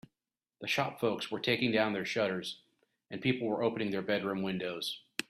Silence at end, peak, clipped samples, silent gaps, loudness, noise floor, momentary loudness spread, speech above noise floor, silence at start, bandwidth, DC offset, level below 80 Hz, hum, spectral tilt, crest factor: 0.05 s; -12 dBFS; under 0.1%; none; -33 LUFS; under -90 dBFS; 9 LU; over 57 dB; 0.6 s; 15.5 kHz; under 0.1%; -72 dBFS; none; -5 dB/octave; 22 dB